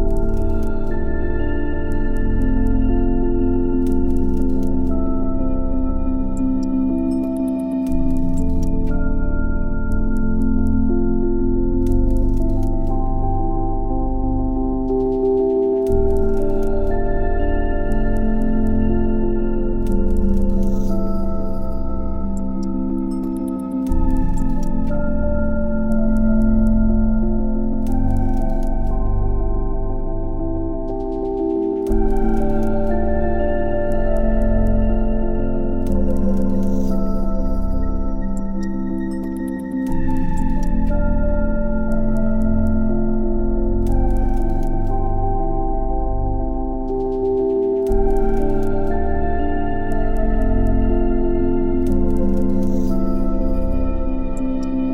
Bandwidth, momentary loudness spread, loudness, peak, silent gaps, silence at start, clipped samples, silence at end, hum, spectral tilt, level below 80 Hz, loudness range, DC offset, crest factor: 3 kHz; 5 LU; -21 LUFS; -4 dBFS; none; 0 s; under 0.1%; 0 s; none; -9.5 dB/octave; -20 dBFS; 3 LU; under 0.1%; 12 dB